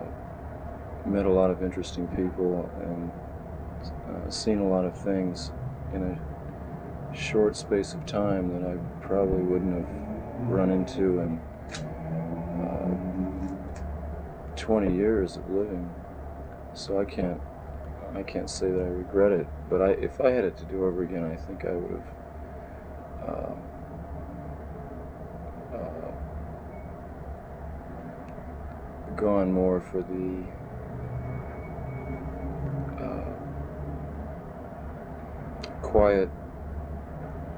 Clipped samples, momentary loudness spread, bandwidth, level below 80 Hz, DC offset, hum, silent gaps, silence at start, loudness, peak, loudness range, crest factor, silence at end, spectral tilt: under 0.1%; 16 LU; 20 kHz; -42 dBFS; under 0.1%; none; none; 0 s; -30 LUFS; -6 dBFS; 11 LU; 22 dB; 0 s; -7 dB/octave